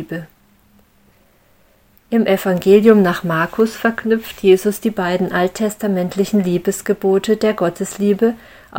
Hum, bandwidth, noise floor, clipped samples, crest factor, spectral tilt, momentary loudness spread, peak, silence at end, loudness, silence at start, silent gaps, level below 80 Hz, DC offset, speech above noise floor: none; 17 kHz; -54 dBFS; under 0.1%; 16 dB; -6 dB/octave; 8 LU; 0 dBFS; 0 s; -16 LUFS; 0 s; none; -52 dBFS; under 0.1%; 38 dB